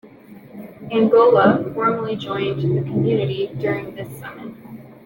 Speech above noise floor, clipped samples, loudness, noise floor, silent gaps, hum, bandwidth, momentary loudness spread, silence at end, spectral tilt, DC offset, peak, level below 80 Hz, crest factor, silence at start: 24 dB; under 0.1%; -18 LUFS; -43 dBFS; none; none; 17 kHz; 23 LU; 0.1 s; -8.5 dB/octave; under 0.1%; -2 dBFS; -56 dBFS; 18 dB; 0.05 s